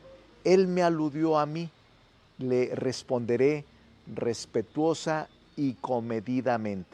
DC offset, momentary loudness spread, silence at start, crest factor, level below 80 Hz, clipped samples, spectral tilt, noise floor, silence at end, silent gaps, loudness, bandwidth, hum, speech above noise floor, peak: under 0.1%; 10 LU; 0.05 s; 20 dB; -66 dBFS; under 0.1%; -6.5 dB/octave; -60 dBFS; 0.1 s; none; -28 LUFS; 10 kHz; none; 32 dB; -10 dBFS